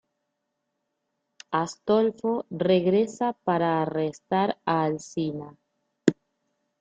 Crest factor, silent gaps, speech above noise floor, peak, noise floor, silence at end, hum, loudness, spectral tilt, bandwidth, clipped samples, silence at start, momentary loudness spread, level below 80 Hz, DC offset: 24 dB; none; 55 dB; -2 dBFS; -80 dBFS; 0.7 s; none; -26 LUFS; -6.5 dB/octave; 9.2 kHz; under 0.1%; 1.5 s; 8 LU; -70 dBFS; under 0.1%